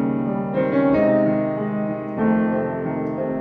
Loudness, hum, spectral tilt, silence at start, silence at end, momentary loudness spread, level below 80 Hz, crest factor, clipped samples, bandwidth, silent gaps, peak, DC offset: -21 LUFS; none; -11 dB/octave; 0 s; 0 s; 8 LU; -52 dBFS; 14 dB; under 0.1%; 4.8 kHz; none; -6 dBFS; under 0.1%